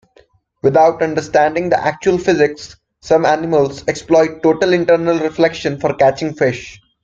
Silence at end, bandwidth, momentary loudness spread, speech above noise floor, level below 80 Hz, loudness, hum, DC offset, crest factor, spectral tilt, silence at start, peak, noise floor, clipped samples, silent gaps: 0.3 s; 7.8 kHz; 7 LU; 38 dB; -50 dBFS; -15 LUFS; none; under 0.1%; 14 dB; -5.5 dB/octave; 0.65 s; 0 dBFS; -52 dBFS; under 0.1%; none